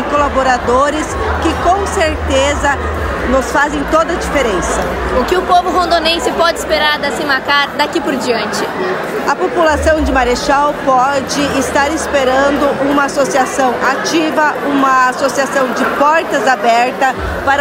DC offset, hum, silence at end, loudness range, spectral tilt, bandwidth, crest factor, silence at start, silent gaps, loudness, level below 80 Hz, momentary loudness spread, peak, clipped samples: under 0.1%; none; 0 s; 2 LU; -4 dB/octave; 16 kHz; 12 dB; 0 s; none; -13 LUFS; -28 dBFS; 4 LU; 0 dBFS; under 0.1%